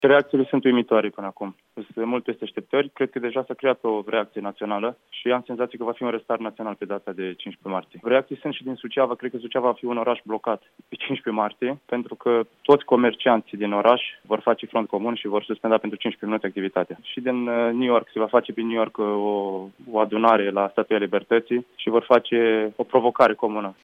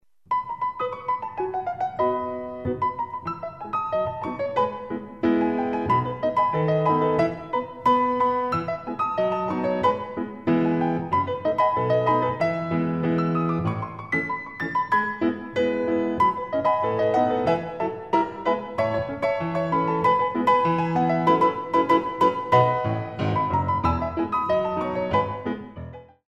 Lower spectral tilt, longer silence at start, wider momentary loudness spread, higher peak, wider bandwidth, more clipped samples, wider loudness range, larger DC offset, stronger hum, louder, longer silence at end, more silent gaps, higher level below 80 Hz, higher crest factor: about the same, -7.5 dB/octave vs -8 dB/octave; second, 0 s vs 0.3 s; first, 12 LU vs 9 LU; first, -2 dBFS vs -6 dBFS; second, 5.8 kHz vs 9 kHz; neither; about the same, 6 LU vs 6 LU; second, under 0.1% vs 0.1%; neither; about the same, -23 LUFS vs -24 LUFS; second, 0.1 s vs 0.25 s; neither; second, -76 dBFS vs -52 dBFS; about the same, 20 dB vs 18 dB